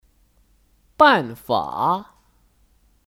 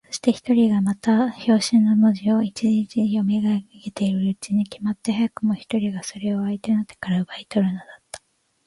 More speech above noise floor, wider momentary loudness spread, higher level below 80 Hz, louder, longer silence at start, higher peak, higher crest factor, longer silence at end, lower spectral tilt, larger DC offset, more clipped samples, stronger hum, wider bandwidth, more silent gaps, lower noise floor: first, 41 dB vs 34 dB; about the same, 9 LU vs 9 LU; about the same, -58 dBFS vs -62 dBFS; first, -19 LUFS vs -22 LUFS; first, 1 s vs 0.1 s; first, -2 dBFS vs -6 dBFS; first, 22 dB vs 16 dB; first, 1.05 s vs 0.5 s; about the same, -5.5 dB/octave vs -6 dB/octave; neither; neither; neither; first, 16.5 kHz vs 11.5 kHz; neither; first, -59 dBFS vs -54 dBFS